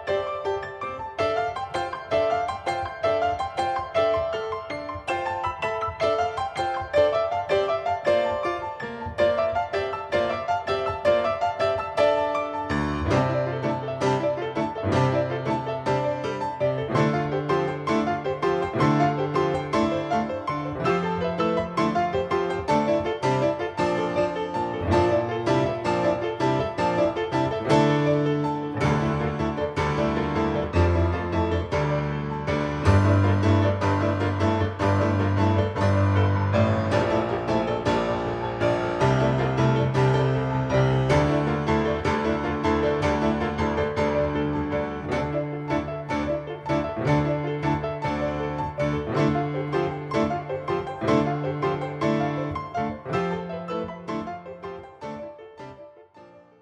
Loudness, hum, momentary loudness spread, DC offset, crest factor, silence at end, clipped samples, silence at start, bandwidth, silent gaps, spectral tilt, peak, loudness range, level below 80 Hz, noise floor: -25 LUFS; none; 7 LU; under 0.1%; 18 dB; 0.2 s; under 0.1%; 0 s; 10 kHz; none; -7 dB/octave; -6 dBFS; 4 LU; -46 dBFS; -50 dBFS